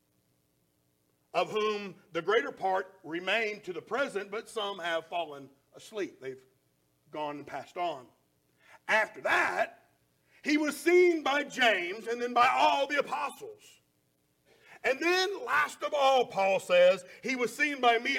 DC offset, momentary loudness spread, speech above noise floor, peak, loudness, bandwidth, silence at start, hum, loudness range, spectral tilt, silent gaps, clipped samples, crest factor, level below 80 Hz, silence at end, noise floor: under 0.1%; 15 LU; 44 dB; -12 dBFS; -29 LUFS; 16.5 kHz; 1.35 s; none; 11 LU; -3 dB/octave; none; under 0.1%; 20 dB; -78 dBFS; 0 s; -73 dBFS